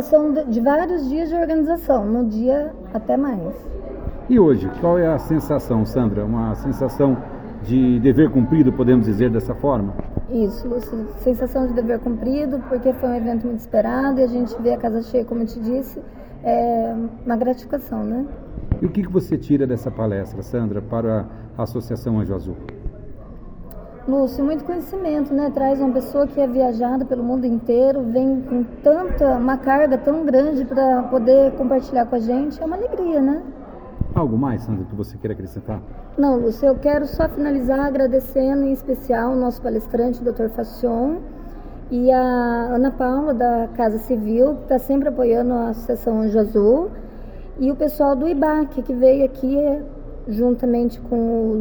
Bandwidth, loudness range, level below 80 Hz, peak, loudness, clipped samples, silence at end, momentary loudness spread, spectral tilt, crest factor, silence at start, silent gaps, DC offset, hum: over 20 kHz; 6 LU; -36 dBFS; -2 dBFS; -20 LUFS; under 0.1%; 0 s; 13 LU; -9 dB/octave; 18 dB; 0 s; none; under 0.1%; none